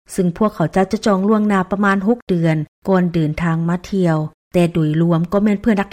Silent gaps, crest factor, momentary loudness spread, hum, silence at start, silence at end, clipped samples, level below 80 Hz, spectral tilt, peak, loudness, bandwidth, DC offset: 2.22-2.27 s, 2.68-2.82 s, 4.34-4.51 s; 12 dB; 4 LU; none; 0.1 s; 0.05 s; under 0.1%; -44 dBFS; -7.5 dB/octave; -4 dBFS; -17 LUFS; 14 kHz; under 0.1%